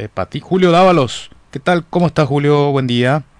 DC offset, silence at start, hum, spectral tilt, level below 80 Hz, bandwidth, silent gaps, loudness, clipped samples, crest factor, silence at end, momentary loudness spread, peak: under 0.1%; 0 s; none; -6.5 dB/octave; -46 dBFS; 10.5 kHz; none; -14 LUFS; under 0.1%; 12 dB; 0.15 s; 13 LU; -2 dBFS